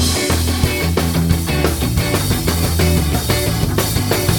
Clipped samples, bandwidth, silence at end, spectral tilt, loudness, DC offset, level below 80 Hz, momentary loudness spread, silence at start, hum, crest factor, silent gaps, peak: under 0.1%; 19 kHz; 0 s; -4.5 dB/octave; -16 LUFS; under 0.1%; -26 dBFS; 2 LU; 0 s; none; 16 dB; none; 0 dBFS